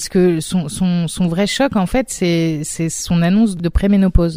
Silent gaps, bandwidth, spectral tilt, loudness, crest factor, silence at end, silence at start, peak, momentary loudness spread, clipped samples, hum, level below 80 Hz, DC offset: none; 16 kHz; -5.5 dB/octave; -16 LUFS; 14 dB; 0 s; 0 s; 0 dBFS; 6 LU; under 0.1%; none; -26 dBFS; under 0.1%